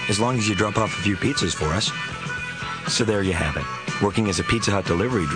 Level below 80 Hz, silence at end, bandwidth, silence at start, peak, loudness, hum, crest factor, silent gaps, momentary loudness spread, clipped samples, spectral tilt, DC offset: -42 dBFS; 0 s; 9.8 kHz; 0 s; -4 dBFS; -23 LUFS; none; 18 dB; none; 7 LU; under 0.1%; -4.5 dB/octave; 0.1%